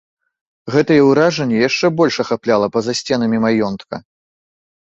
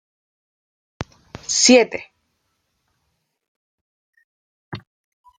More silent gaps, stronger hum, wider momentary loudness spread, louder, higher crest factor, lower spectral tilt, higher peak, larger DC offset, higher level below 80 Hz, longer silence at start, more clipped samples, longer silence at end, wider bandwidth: second, none vs 3.48-4.13 s, 4.24-4.72 s; neither; second, 13 LU vs 25 LU; about the same, -15 LUFS vs -15 LUFS; second, 16 dB vs 24 dB; first, -5.5 dB/octave vs -2 dB/octave; about the same, -2 dBFS vs 0 dBFS; neither; about the same, -54 dBFS vs -58 dBFS; second, 0.65 s vs 1 s; neither; first, 0.85 s vs 0.6 s; second, 8.2 kHz vs 10 kHz